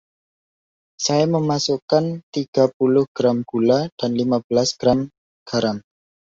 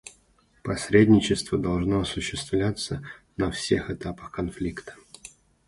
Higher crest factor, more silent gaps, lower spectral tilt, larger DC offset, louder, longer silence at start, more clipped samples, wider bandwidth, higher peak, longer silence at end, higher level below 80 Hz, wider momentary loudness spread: about the same, 18 dB vs 22 dB; first, 1.82-1.88 s, 2.23-2.33 s, 2.48-2.53 s, 2.74-2.80 s, 3.08-3.15 s, 3.92-3.97 s, 4.44-4.50 s, 5.18-5.46 s vs none; about the same, -5.5 dB/octave vs -5.5 dB/octave; neither; first, -20 LUFS vs -25 LUFS; first, 1 s vs 0.05 s; neither; second, 7.8 kHz vs 11.5 kHz; about the same, -4 dBFS vs -4 dBFS; first, 0.55 s vs 0.4 s; second, -56 dBFS vs -46 dBFS; second, 7 LU vs 21 LU